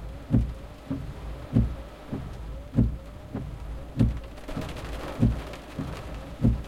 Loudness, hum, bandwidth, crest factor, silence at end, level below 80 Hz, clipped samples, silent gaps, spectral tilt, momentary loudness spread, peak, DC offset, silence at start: -31 LUFS; none; 13 kHz; 20 dB; 0 s; -34 dBFS; under 0.1%; none; -8 dB/octave; 13 LU; -8 dBFS; under 0.1%; 0 s